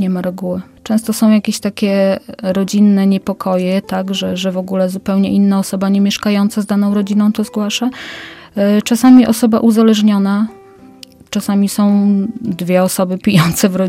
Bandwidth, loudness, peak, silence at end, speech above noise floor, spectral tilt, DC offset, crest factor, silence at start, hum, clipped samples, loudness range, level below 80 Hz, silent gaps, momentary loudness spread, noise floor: 16.5 kHz; -14 LUFS; 0 dBFS; 0 s; 26 dB; -6 dB/octave; under 0.1%; 14 dB; 0 s; none; under 0.1%; 3 LU; -50 dBFS; none; 10 LU; -39 dBFS